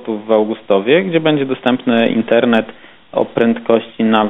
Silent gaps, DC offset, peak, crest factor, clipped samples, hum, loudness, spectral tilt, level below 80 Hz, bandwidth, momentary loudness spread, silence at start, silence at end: none; under 0.1%; 0 dBFS; 14 dB; under 0.1%; none; -15 LUFS; -8 dB/octave; -58 dBFS; 4 kHz; 5 LU; 0 s; 0 s